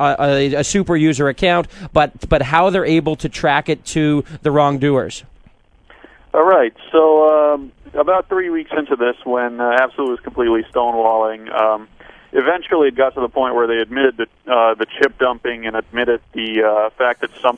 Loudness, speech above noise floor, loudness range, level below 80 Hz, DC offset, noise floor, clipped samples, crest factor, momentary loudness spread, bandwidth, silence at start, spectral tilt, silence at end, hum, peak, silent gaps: -16 LUFS; 33 dB; 2 LU; -40 dBFS; under 0.1%; -49 dBFS; under 0.1%; 16 dB; 7 LU; 10.5 kHz; 0 s; -5.5 dB/octave; 0 s; none; 0 dBFS; none